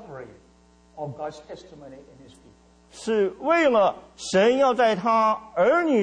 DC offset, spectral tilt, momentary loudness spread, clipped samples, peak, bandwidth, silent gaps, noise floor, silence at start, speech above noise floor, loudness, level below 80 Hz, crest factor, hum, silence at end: under 0.1%; -5 dB/octave; 22 LU; under 0.1%; -10 dBFS; 10 kHz; none; -56 dBFS; 0 s; 33 dB; -21 LUFS; -60 dBFS; 14 dB; none; 0 s